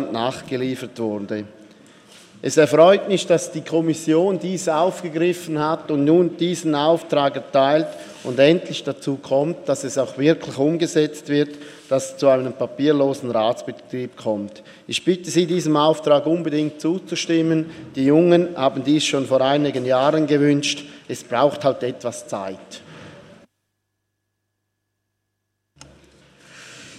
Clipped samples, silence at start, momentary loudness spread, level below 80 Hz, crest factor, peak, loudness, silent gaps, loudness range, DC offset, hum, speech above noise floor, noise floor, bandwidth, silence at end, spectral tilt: under 0.1%; 0 s; 13 LU; -68 dBFS; 20 dB; -2 dBFS; -20 LUFS; none; 4 LU; under 0.1%; 50 Hz at -55 dBFS; 57 dB; -76 dBFS; 14 kHz; 0 s; -5.5 dB/octave